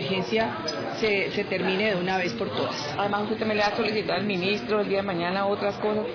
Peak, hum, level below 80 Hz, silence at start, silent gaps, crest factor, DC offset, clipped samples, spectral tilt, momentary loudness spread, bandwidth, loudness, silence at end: -12 dBFS; none; -58 dBFS; 0 s; none; 14 dB; under 0.1%; under 0.1%; -5.5 dB/octave; 4 LU; 5.4 kHz; -26 LUFS; 0 s